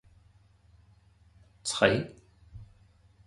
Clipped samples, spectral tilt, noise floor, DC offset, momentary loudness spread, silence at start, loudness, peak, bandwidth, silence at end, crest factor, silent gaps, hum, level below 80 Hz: under 0.1%; -4 dB/octave; -61 dBFS; under 0.1%; 27 LU; 1.65 s; -28 LUFS; -6 dBFS; 11.5 kHz; 0.65 s; 28 dB; none; 50 Hz at -50 dBFS; -58 dBFS